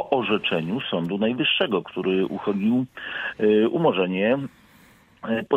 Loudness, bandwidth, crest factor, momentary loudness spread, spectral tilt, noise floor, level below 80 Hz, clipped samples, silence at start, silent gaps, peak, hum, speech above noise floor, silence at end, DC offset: -23 LUFS; 7 kHz; 18 dB; 9 LU; -7.5 dB/octave; -54 dBFS; -64 dBFS; under 0.1%; 0 s; none; -6 dBFS; none; 31 dB; 0 s; under 0.1%